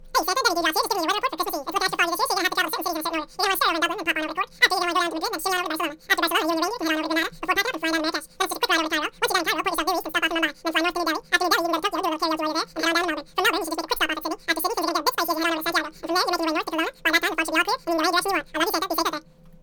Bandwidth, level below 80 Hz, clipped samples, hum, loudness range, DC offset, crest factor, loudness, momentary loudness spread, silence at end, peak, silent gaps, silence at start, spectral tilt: 19 kHz; -52 dBFS; under 0.1%; none; 1 LU; under 0.1%; 22 dB; -23 LUFS; 5 LU; 0.1 s; -2 dBFS; none; 0 s; -1 dB/octave